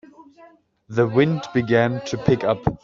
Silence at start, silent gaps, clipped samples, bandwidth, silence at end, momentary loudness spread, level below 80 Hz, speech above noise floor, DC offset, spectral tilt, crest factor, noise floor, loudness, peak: 0.2 s; none; under 0.1%; 7.6 kHz; 0.1 s; 5 LU; -48 dBFS; 31 dB; under 0.1%; -6 dB/octave; 18 dB; -51 dBFS; -21 LUFS; -4 dBFS